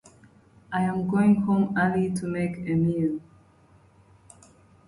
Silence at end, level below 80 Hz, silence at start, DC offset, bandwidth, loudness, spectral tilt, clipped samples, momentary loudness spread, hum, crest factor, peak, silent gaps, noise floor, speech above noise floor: 1.65 s; -58 dBFS; 0.7 s; under 0.1%; 11.5 kHz; -25 LUFS; -8 dB/octave; under 0.1%; 8 LU; none; 16 dB; -10 dBFS; none; -57 dBFS; 33 dB